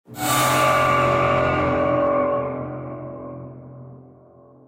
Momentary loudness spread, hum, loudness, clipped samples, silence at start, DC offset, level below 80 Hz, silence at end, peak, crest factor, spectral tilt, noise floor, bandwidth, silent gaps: 20 LU; none; -19 LUFS; under 0.1%; 0.1 s; under 0.1%; -48 dBFS; 0.65 s; -8 dBFS; 14 dB; -4.5 dB/octave; -49 dBFS; 16 kHz; none